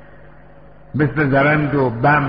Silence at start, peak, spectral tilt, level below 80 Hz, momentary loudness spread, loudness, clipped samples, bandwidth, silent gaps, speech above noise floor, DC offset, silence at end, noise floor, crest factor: 0.95 s; -2 dBFS; -6 dB/octave; -42 dBFS; 6 LU; -17 LUFS; under 0.1%; 5.2 kHz; none; 29 dB; 0.6%; 0 s; -44 dBFS; 14 dB